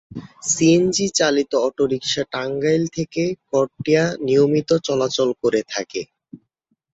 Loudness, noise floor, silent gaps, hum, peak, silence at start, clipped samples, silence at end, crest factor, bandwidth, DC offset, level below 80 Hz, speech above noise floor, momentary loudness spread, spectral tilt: -19 LUFS; -71 dBFS; none; none; -4 dBFS; 0.1 s; under 0.1%; 0.55 s; 16 dB; 8.2 kHz; under 0.1%; -58 dBFS; 52 dB; 10 LU; -4 dB/octave